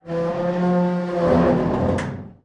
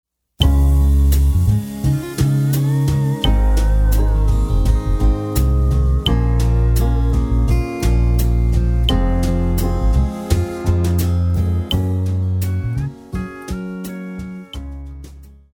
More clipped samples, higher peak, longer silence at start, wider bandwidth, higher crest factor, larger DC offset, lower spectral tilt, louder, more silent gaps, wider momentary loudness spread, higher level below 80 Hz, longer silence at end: neither; second, -6 dBFS vs 0 dBFS; second, 0.05 s vs 0.4 s; second, 9.2 kHz vs 18 kHz; about the same, 14 dB vs 16 dB; neither; first, -8.5 dB/octave vs -6.5 dB/octave; about the same, -20 LUFS vs -18 LUFS; neither; second, 7 LU vs 12 LU; second, -42 dBFS vs -18 dBFS; second, 0.1 s vs 0.25 s